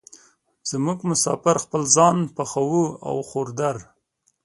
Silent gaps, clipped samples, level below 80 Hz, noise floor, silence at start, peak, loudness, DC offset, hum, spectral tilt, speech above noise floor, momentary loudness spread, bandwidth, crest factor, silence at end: none; under 0.1%; -62 dBFS; -69 dBFS; 0.65 s; -2 dBFS; -21 LUFS; under 0.1%; none; -4.5 dB/octave; 47 dB; 13 LU; 11.5 kHz; 22 dB; 0.6 s